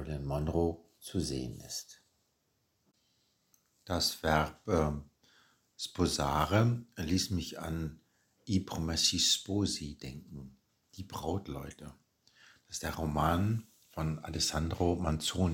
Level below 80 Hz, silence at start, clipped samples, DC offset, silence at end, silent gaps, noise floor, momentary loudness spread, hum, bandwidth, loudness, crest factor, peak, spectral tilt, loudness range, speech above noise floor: -48 dBFS; 0 s; under 0.1%; under 0.1%; 0 s; none; -77 dBFS; 17 LU; none; 17 kHz; -33 LUFS; 22 dB; -12 dBFS; -4.5 dB/octave; 8 LU; 44 dB